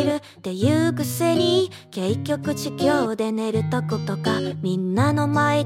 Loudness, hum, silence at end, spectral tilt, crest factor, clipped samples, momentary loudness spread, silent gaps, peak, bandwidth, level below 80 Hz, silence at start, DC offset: -22 LUFS; none; 0 s; -6 dB/octave; 16 dB; under 0.1%; 6 LU; none; -6 dBFS; 16.5 kHz; -62 dBFS; 0 s; under 0.1%